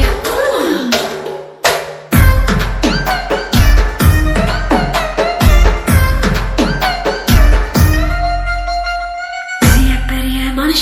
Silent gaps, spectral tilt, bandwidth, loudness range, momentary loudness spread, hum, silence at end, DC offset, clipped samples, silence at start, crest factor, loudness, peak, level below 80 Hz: none; -5 dB/octave; 17 kHz; 2 LU; 7 LU; none; 0 s; under 0.1%; 0.3%; 0 s; 12 dB; -14 LUFS; 0 dBFS; -16 dBFS